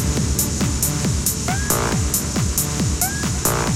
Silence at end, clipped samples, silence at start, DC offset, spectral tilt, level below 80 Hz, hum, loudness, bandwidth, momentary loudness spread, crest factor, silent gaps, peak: 0 s; under 0.1%; 0 s; under 0.1%; -4 dB/octave; -28 dBFS; none; -19 LUFS; 17 kHz; 1 LU; 18 dB; none; -2 dBFS